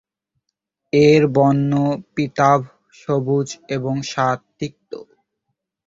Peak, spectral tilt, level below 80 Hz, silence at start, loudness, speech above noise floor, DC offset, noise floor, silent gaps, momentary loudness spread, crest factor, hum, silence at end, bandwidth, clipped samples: -2 dBFS; -6.5 dB/octave; -56 dBFS; 0.95 s; -18 LUFS; 60 dB; under 0.1%; -77 dBFS; none; 20 LU; 18 dB; none; 0.85 s; 7.8 kHz; under 0.1%